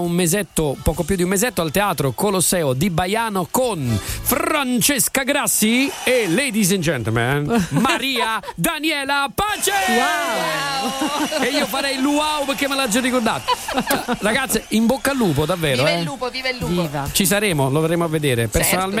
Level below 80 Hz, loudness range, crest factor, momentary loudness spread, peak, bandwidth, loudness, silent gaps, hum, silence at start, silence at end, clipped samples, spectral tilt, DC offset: -40 dBFS; 2 LU; 16 dB; 5 LU; -2 dBFS; 16 kHz; -19 LUFS; none; none; 0 s; 0 s; under 0.1%; -3.5 dB/octave; under 0.1%